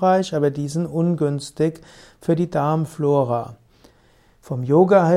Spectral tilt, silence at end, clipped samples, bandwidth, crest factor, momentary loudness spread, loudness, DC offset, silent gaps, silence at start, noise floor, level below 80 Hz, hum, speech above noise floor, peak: -7.5 dB/octave; 0 s; under 0.1%; 13.5 kHz; 18 dB; 10 LU; -21 LUFS; under 0.1%; none; 0 s; -55 dBFS; -58 dBFS; none; 36 dB; -2 dBFS